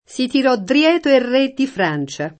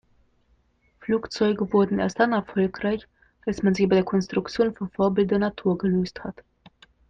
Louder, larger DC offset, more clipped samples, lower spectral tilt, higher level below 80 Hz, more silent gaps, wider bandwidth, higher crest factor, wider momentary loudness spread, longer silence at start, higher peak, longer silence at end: first, -16 LUFS vs -24 LUFS; neither; neither; second, -5 dB/octave vs -7 dB/octave; second, -60 dBFS vs -54 dBFS; neither; first, 8.8 kHz vs 7.6 kHz; about the same, 14 dB vs 18 dB; second, 6 LU vs 10 LU; second, 0.1 s vs 1 s; first, -2 dBFS vs -8 dBFS; second, 0.1 s vs 0.75 s